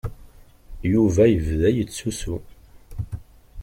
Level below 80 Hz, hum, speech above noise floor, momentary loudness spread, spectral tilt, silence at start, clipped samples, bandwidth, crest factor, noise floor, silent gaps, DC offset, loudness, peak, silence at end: -38 dBFS; none; 27 dB; 19 LU; -7 dB/octave; 0.05 s; under 0.1%; 16.5 kHz; 18 dB; -47 dBFS; none; under 0.1%; -21 LUFS; -6 dBFS; 0 s